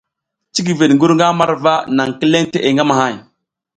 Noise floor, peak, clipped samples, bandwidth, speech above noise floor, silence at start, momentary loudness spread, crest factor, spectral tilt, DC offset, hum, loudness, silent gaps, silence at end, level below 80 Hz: -77 dBFS; 0 dBFS; under 0.1%; 9.4 kHz; 64 dB; 0.55 s; 9 LU; 14 dB; -5 dB/octave; under 0.1%; none; -14 LUFS; none; 0.55 s; -58 dBFS